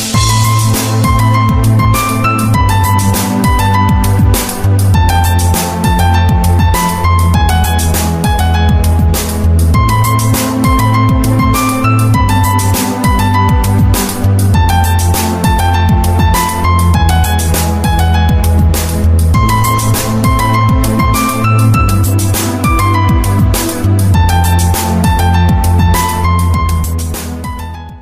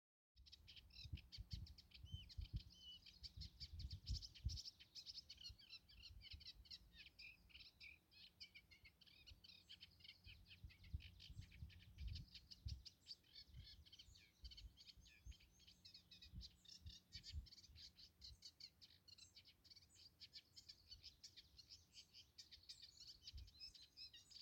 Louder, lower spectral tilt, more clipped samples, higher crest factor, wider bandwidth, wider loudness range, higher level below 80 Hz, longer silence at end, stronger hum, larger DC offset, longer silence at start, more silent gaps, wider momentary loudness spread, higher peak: first, -10 LUFS vs -60 LUFS; first, -5.5 dB/octave vs -3 dB/octave; neither; second, 10 dB vs 24 dB; about the same, 16 kHz vs 16.5 kHz; second, 1 LU vs 8 LU; first, -16 dBFS vs -64 dBFS; about the same, 0 s vs 0 s; neither; first, 0.3% vs under 0.1%; second, 0 s vs 0.35 s; neither; second, 3 LU vs 9 LU; first, 0 dBFS vs -36 dBFS